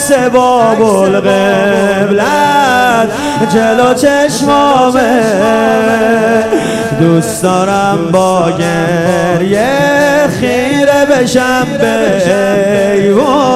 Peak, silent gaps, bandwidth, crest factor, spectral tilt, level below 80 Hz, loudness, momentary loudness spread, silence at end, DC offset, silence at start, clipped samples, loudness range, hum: 0 dBFS; none; 15.5 kHz; 8 dB; -5 dB/octave; -44 dBFS; -9 LUFS; 3 LU; 0 s; under 0.1%; 0 s; 0.3%; 1 LU; none